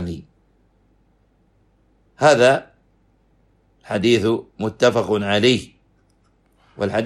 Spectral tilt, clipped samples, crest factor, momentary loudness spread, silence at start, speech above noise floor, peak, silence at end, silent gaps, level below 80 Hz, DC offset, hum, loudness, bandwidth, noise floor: -5 dB/octave; under 0.1%; 20 dB; 13 LU; 0 s; 43 dB; -2 dBFS; 0 s; none; -54 dBFS; under 0.1%; none; -18 LUFS; 12.5 kHz; -60 dBFS